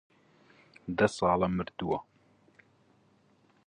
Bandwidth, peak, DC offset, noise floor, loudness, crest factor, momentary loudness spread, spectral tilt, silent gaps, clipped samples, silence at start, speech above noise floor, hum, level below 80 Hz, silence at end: 10.5 kHz; -10 dBFS; under 0.1%; -66 dBFS; -30 LUFS; 24 dB; 10 LU; -6 dB/octave; none; under 0.1%; 0.85 s; 37 dB; none; -58 dBFS; 1.65 s